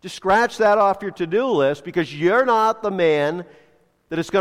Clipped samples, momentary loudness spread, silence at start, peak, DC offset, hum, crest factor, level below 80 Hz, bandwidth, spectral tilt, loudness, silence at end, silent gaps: under 0.1%; 9 LU; 0.05 s; -6 dBFS; under 0.1%; none; 12 dB; -56 dBFS; 14.5 kHz; -5.5 dB/octave; -19 LUFS; 0 s; none